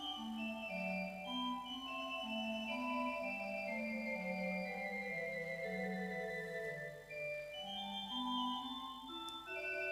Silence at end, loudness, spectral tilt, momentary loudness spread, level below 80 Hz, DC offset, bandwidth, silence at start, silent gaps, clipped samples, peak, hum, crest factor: 0 s; -42 LUFS; -4.5 dB/octave; 5 LU; -72 dBFS; under 0.1%; 15.5 kHz; 0 s; none; under 0.1%; -28 dBFS; 50 Hz at -70 dBFS; 14 dB